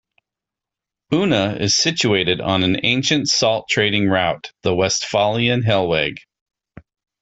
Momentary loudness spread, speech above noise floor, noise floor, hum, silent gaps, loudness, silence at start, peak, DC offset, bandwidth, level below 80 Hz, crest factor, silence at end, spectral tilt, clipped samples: 4 LU; 68 dB; -86 dBFS; none; none; -17 LUFS; 1.1 s; -2 dBFS; under 0.1%; 8.4 kHz; -52 dBFS; 16 dB; 1 s; -4 dB/octave; under 0.1%